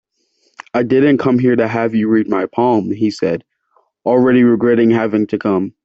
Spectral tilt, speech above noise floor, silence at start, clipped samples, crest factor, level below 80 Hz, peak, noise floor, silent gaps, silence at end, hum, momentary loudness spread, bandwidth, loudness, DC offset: -8 dB/octave; 48 dB; 0.75 s; under 0.1%; 12 dB; -56 dBFS; -2 dBFS; -62 dBFS; none; 0.15 s; none; 8 LU; 7.8 kHz; -14 LUFS; under 0.1%